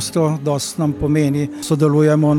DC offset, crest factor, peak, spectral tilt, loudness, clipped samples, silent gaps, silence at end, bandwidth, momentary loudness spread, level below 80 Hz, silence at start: under 0.1%; 12 dB; -4 dBFS; -6.5 dB/octave; -17 LUFS; under 0.1%; none; 0 s; 14.5 kHz; 7 LU; -42 dBFS; 0 s